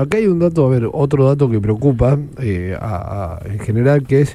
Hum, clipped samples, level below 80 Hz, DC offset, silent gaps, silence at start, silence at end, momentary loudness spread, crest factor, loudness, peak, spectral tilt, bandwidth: none; under 0.1%; -36 dBFS; under 0.1%; none; 0 s; 0 s; 10 LU; 14 dB; -16 LUFS; 0 dBFS; -9 dB/octave; 11.5 kHz